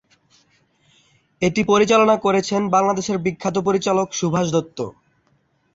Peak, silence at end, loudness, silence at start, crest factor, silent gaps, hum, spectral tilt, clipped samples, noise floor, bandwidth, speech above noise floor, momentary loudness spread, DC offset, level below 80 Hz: -4 dBFS; 0.85 s; -19 LUFS; 1.4 s; 16 dB; none; none; -5 dB/octave; under 0.1%; -63 dBFS; 8 kHz; 45 dB; 8 LU; under 0.1%; -56 dBFS